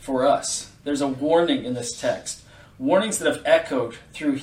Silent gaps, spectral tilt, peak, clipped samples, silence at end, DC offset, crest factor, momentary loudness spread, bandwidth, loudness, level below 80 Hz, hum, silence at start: none; -3.5 dB/octave; -4 dBFS; under 0.1%; 0 s; under 0.1%; 20 dB; 10 LU; 16 kHz; -23 LUFS; -56 dBFS; 50 Hz at -55 dBFS; 0 s